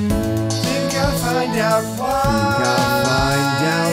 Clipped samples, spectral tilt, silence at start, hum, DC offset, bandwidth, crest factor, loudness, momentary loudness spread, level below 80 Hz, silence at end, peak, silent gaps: under 0.1%; -4.5 dB/octave; 0 s; none; under 0.1%; 16 kHz; 14 dB; -18 LUFS; 3 LU; -34 dBFS; 0 s; -4 dBFS; none